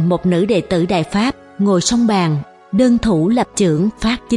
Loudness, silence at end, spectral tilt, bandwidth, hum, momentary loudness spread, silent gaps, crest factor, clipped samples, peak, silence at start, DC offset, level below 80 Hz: -16 LUFS; 0 s; -5.5 dB/octave; 11.5 kHz; none; 6 LU; none; 14 dB; under 0.1%; -2 dBFS; 0 s; under 0.1%; -40 dBFS